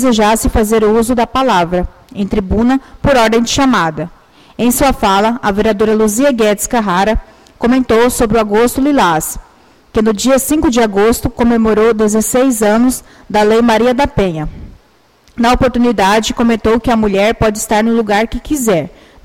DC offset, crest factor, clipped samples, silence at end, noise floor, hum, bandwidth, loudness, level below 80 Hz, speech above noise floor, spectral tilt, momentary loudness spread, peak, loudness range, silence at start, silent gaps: under 0.1%; 10 dB; under 0.1%; 0.35 s; -50 dBFS; none; 16.5 kHz; -12 LUFS; -28 dBFS; 38 dB; -4.5 dB/octave; 7 LU; -2 dBFS; 2 LU; 0 s; none